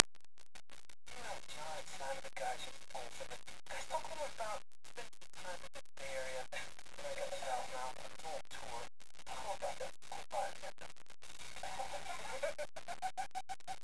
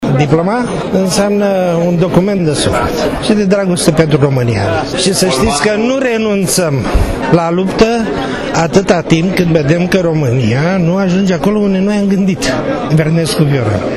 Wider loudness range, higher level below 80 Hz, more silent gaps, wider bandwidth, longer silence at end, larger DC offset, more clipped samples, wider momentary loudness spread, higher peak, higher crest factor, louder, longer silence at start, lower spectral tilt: about the same, 2 LU vs 1 LU; second, -70 dBFS vs -28 dBFS; neither; second, 11 kHz vs 13 kHz; about the same, 0 s vs 0 s; first, 0.8% vs under 0.1%; second, under 0.1% vs 0.1%; first, 12 LU vs 4 LU; about the same, 0 dBFS vs 0 dBFS; first, 46 dB vs 12 dB; second, -45 LUFS vs -12 LUFS; about the same, 0 s vs 0 s; second, -1.5 dB/octave vs -5.5 dB/octave